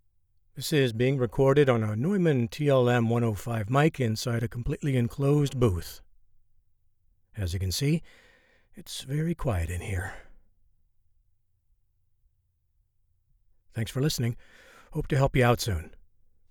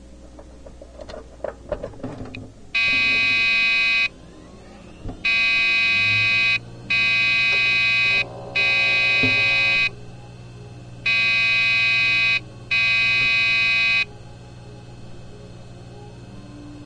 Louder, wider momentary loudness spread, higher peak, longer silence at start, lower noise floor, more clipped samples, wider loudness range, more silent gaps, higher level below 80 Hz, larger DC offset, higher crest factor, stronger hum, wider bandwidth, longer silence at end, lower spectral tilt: second, -27 LUFS vs -17 LUFS; second, 13 LU vs 18 LU; second, -10 dBFS vs -6 dBFS; first, 0.55 s vs 0 s; first, -71 dBFS vs -42 dBFS; neither; first, 11 LU vs 4 LU; neither; about the same, -46 dBFS vs -46 dBFS; neither; about the same, 18 dB vs 16 dB; neither; first, 18 kHz vs 10 kHz; first, 0.55 s vs 0 s; first, -6 dB/octave vs -2.5 dB/octave